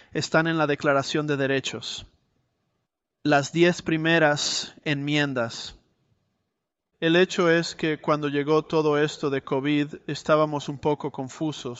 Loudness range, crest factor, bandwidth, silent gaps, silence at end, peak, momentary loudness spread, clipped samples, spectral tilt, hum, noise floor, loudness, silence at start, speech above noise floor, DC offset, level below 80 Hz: 2 LU; 18 dB; 8.2 kHz; none; 0 s; -6 dBFS; 10 LU; under 0.1%; -5 dB/octave; none; -81 dBFS; -24 LUFS; 0.15 s; 58 dB; under 0.1%; -62 dBFS